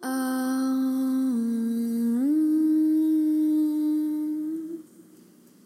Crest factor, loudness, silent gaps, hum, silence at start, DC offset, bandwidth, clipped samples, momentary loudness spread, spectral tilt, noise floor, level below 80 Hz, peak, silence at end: 8 dB; -25 LUFS; none; none; 0 s; under 0.1%; 15 kHz; under 0.1%; 8 LU; -5.5 dB/octave; -54 dBFS; -88 dBFS; -16 dBFS; 0.85 s